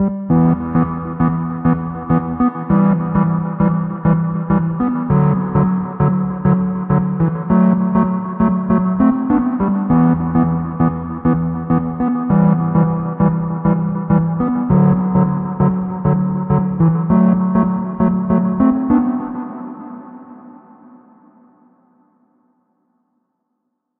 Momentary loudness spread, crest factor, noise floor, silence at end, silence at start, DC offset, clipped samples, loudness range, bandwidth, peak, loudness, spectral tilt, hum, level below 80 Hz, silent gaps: 5 LU; 16 dB; -72 dBFS; 3.45 s; 0 s; under 0.1%; under 0.1%; 3 LU; 3 kHz; 0 dBFS; -16 LUFS; -11.5 dB/octave; none; -40 dBFS; none